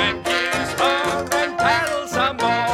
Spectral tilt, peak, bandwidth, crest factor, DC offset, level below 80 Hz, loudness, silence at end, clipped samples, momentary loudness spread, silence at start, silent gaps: -3 dB/octave; -4 dBFS; 16.5 kHz; 16 dB; under 0.1%; -48 dBFS; -20 LUFS; 0 s; under 0.1%; 3 LU; 0 s; none